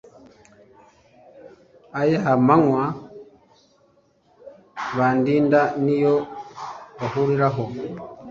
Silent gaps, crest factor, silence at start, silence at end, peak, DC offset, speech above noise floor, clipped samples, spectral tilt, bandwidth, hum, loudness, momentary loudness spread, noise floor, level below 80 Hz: none; 20 dB; 1.35 s; 0 s; -2 dBFS; under 0.1%; 41 dB; under 0.1%; -8.5 dB/octave; 7.4 kHz; none; -20 LUFS; 19 LU; -60 dBFS; -60 dBFS